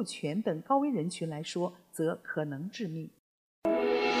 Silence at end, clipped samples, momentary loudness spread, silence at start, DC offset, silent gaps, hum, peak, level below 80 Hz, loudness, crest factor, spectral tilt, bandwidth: 0 s; under 0.1%; 9 LU; 0 s; under 0.1%; 3.19-3.62 s; none; -16 dBFS; -72 dBFS; -33 LUFS; 18 dB; -5.5 dB/octave; 15.5 kHz